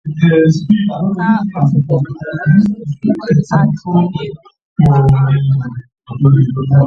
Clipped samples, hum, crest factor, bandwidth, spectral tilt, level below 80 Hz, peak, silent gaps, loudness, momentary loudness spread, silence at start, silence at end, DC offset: under 0.1%; none; 12 dB; 7 kHz; -9 dB/octave; -38 dBFS; 0 dBFS; 4.65-4.76 s; -13 LUFS; 10 LU; 0.05 s; 0 s; under 0.1%